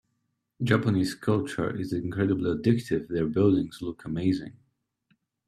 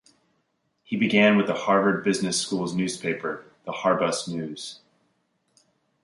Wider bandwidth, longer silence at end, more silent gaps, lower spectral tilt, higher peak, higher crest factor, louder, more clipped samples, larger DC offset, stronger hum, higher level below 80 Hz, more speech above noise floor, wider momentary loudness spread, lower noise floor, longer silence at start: first, 13.5 kHz vs 11.5 kHz; second, 0.95 s vs 1.25 s; neither; first, -7.5 dB/octave vs -4.5 dB/octave; second, -8 dBFS vs -4 dBFS; about the same, 20 dB vs 22 dB; second, -27 LUFS vs -24 LUFS; neither; neither; neither; first, -58 dBFS vs -68 dBFS; about the same, 51 dB vs 49 dB; second, 10 LU vs 15 LU; first, -78 dBFS vs -73 dBFS; second, 0.6 s vs 0.9 s